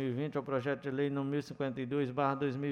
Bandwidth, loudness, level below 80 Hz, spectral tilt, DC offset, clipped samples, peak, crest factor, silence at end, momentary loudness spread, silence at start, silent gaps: 9.2 kHz; -35 LUFS; -72 dBFS; -8 dB/octave; under 0.1%; under 0.1%; -18 dBFS; 16 dB; 0 s; 4 LU; 0 s; none